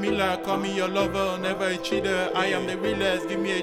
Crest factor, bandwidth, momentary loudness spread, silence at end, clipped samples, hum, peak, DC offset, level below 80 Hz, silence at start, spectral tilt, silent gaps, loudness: 14 dB; 16.5 kHz; 2 LU; 0 s; under 0.1%; none; -10 dBFS; under 0.1%; -50 dBFS; 0 s; -4.5 dB/octave; none; -25 LUFS